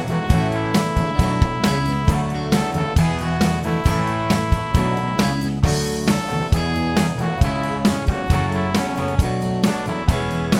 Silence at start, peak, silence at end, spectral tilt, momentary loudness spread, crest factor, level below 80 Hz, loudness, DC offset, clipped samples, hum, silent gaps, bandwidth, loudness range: 0 s; -2 dBFS; 0 s; -6 dB/octave; 2 LU; 16 dB; -28 dBFS; -20 LUFS; under 0.1%; under 0.1%; none; none; 17 kHz; 1 LU